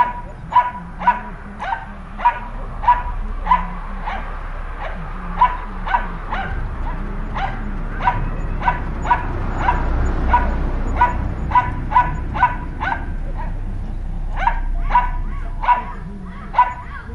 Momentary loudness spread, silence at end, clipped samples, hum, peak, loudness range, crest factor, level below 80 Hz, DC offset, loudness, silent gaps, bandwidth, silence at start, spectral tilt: 12 LU; 0 s; under 0.1%; none; -2 dBFS; 4 LU; 18 dB; -24 dBFS; under 0.1%; -21 LUFS; none; 7.2 kHz; 0 s; -7 dB/octave